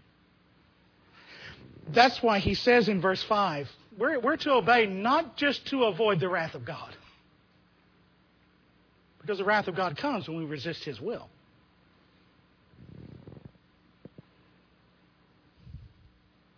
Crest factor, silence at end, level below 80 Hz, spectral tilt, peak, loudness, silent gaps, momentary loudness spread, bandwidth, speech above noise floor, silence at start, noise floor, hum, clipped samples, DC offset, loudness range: 24 dB; 0.75 s; -58 dBFS; -5.5 dB/octave; -8 dBFS; -27 LUFS; none; 24 LU; 5.4 kHz; 37 dB; 1.3 s; -64 dBFS; none; under 0.1%; under 0.1%; 14 LU